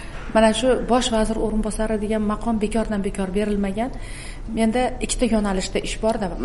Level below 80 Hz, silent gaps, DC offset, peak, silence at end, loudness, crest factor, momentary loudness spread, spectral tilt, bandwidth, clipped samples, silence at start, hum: -32 dBFS; none; 0.7%; -4 dBFS; 0 s; -22 LUFS; 18 dB; 7 LU; -5 dB/octave; 11.5 kHz; under 0.1%; 0 s; none